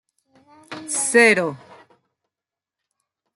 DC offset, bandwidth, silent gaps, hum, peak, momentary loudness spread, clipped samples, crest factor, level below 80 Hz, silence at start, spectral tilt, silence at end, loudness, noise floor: under 0.1%; 12.5 kHz; none; none; -2 dBFS; 22 LU; under 0.1%; 22 dB; -76 dBFS; 0.7 s; -2.5 dB/octave; 1.8 s; -17 LUFS; -89 dBFS